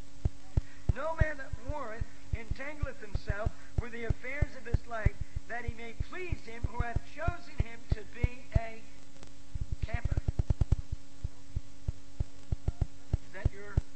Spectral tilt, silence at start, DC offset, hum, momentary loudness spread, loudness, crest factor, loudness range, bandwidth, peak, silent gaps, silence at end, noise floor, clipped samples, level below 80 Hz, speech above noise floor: -7 dB/octave; 0.05 s; 2%; none; 10 LU; -37 LUFS; 24 dB; 1 LU; 8.4 kHz; -10 dBFS; none; 0.05 s; -54 dBFS; under 0.1%; -38 dBFS; 19 dB